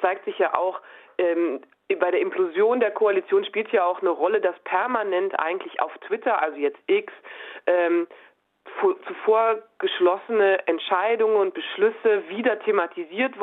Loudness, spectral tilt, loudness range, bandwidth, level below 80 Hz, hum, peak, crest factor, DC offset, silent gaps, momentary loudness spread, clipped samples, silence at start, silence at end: -23 LUFS; -6.5 dB/octave; 3 LU; 4 kHz; -78 dBFS; none; -4 dBFS; 18 dB; under 0.1%; none; 8 LU; under 0.1%; 0 s; 0 s